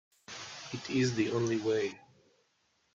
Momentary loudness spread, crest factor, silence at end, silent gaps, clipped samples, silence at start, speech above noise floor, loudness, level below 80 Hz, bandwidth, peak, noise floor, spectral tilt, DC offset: 15 LU; 16 dB; 0.95 s; none; under 0.1%; 0.3 s; 43 dB; -33 LUFS; -72 dBFS; 7.8 kHz; -18 dBFS; -74 dBFS; -5.5 dB/octave; under 0.1%